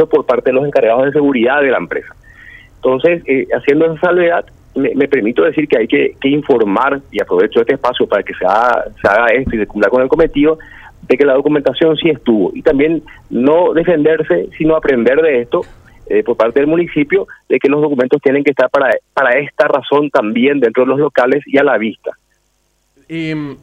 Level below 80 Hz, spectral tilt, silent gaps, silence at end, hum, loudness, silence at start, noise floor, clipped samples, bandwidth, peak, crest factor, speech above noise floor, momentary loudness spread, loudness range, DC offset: -42 dBFS; -7.5 dB/octave; none; 0.1 s; none; -13 LUFS; 0 s; -60 dBFS; under 0.1%; 7.6 kHz; 0 dBFS; 12 dB; 48 dB; 6 LU; 1 LU; under 0.1%